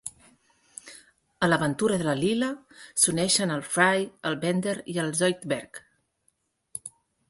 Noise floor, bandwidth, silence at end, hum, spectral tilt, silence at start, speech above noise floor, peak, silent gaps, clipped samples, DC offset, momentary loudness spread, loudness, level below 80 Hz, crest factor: -72 dBFS; 12 kHz; 0.4 s; none; -3.5 dB/octave; 0.05 s; 46 dB; -6 dBFS; none; under 0.1%; under 0.1%; 22 LU; -25 LUFS; -64 dBFS; 22 dB